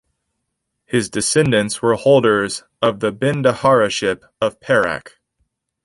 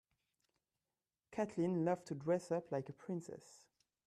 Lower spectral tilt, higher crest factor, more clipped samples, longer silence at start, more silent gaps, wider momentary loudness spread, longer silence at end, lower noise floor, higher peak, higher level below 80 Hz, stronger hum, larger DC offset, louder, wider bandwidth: second, -4.5 dB/octave vs -7.5 dB/octave; about the same, 16 dB vs 18 dB; neither; second, 0.9 s vs 1.3 s; neither; about the same, 9 LU vs 11 LU; first, 0.75 s vs 0.5 s; second, -75 dBFS vs under -90 dBFS; first, -2 dBFS vs -26 dBFS; first, -52 dBFS vs -82 dBFS; neither; neither; first, -17 LUFS vs -41 LUFS; about the same, 11.5 kHz vs 12.5 kHz